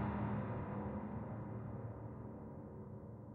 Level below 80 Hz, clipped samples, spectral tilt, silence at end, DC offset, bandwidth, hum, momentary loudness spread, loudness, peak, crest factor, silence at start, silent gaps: -60 dBFS; under 0.1%; -9 dB/octave; 0 s; under 0.1%; 4 kHz; none; 10 LU; -46 LUFS; -28 dBFS; 16 dB; 0 s; none